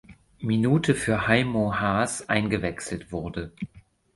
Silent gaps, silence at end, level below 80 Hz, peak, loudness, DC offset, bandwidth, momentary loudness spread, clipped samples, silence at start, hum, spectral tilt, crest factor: none; 0.35 s; -48 dBFS; -4 dBFS; -25 LUFS; under 0.1%; 11.5 kHz; 13 LU; under 0.1%; 0.1 s; none; -5.5 dB/octave; 22 dB